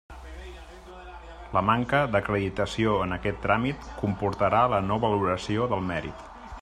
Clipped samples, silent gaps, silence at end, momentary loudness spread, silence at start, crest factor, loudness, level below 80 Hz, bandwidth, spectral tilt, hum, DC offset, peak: under 0.1%; none; 0 s; 21 LU; 0.1 s; 20 dB; -26 LUFS; -46 dBFS; 10.5 kHz; -6.5 dB/octave; none; under 0.1%; -6 dBFS